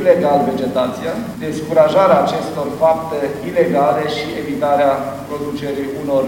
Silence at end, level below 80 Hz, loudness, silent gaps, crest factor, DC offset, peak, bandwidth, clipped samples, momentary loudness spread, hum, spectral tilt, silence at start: 0 s; -50 dBFS; -17 LUFS; none; 16 dB; under 0.1%; 0 dBFS; 17 kHz; under 0.1%; 11 LU; none; -6 dB/octave; 0 s